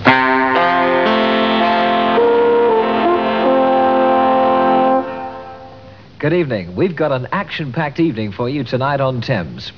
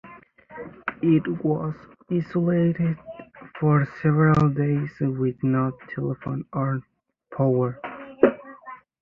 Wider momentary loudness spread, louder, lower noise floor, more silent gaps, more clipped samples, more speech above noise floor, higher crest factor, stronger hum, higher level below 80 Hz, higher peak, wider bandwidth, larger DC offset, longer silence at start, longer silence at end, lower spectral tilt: second, 8 LU vs 20 LU; first, -15 LUFS vs -24 LUFS; second, -38 dBFS vs -47 dBFS; neither; neither; second, 20 dB vs 25 dB; second, 14 dB vs 22 dB; neither; about the same, -52 dBFS vs -54 dBFS; about the same, 0 dBFS vs -2 dBFS; about the same, 5.4 kHz vs 5.4 kHz; first, 0.4% vs under 0.1%; about the same, 0 s vs 0.05 s; second, 0.05 s vs 0.25 s; second, -7.5 dB/octave vs -10.5 dB/octave